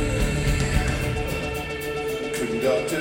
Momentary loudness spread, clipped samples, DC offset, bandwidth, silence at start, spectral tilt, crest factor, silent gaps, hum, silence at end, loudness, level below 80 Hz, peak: 5 LU; under 0.1%; under 0.1%; 17 kHz; 0 s; -5 dB/octave; 18 dB; none; none; 0 s; -25 LUFS; -30 dBFS; -6 dBFS